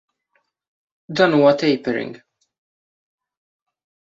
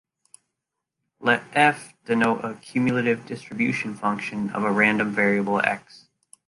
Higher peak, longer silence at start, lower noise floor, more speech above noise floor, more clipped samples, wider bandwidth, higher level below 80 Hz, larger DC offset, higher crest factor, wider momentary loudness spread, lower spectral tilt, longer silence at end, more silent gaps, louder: about the same, -2 dBFS vs -4 dBFS; about the same, 1.1 s vs 1.2 s; second, -69 dBFS vs -83 dBFS; second, 52 dB vs 60 dB; neither; second, 7.6 kHz vs 11.5 kHz; about the same, -64 dBFS vs -66 dBFS; neither; about the same, 20 dB vs 22 dB; first, 14 LU vs 9 LU; about the same, -6 dB/octave vs -6 dB/octave; first, 1.9 s vs 0.7 s; neither; first, -18 LUFS vs -23 LUFS